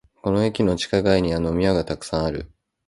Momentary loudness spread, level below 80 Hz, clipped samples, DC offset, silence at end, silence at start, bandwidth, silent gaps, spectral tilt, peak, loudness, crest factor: 7 LU; -40 dBFS; under 0.1%; under 0.1%; 0.4 s; 0.25 s; 11.5 kHz; none; -6 dB/octave; -4 dBFS; -22 LUFS; 18 dB